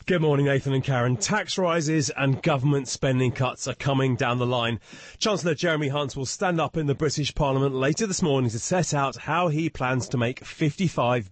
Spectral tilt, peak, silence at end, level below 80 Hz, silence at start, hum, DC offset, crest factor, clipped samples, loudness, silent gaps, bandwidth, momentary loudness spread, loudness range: -5 dB/octave; -12 dBFS; 0 s; -48 dBFS; 0.05 s; none; under 0.1%; 12 dB; under 0.1%; -25 LUFS; none; 8.8 kHz; 4 LU; 2 LU